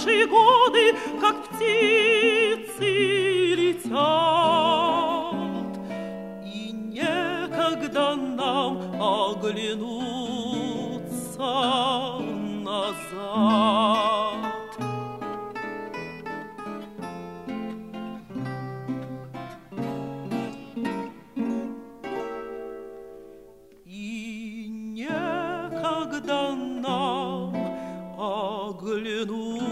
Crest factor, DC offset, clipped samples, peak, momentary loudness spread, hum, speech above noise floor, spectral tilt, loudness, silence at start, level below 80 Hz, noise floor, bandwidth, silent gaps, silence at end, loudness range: 20 dB; under 0.1%; under 0.1%; -6 dBFS; 17 LU; none; 30 dB; -4.5 dB/octave; -25 LUFS; 0 s; -64 dBFS; -50 dBFS; 15 kHz; none; 0 s; 14 LU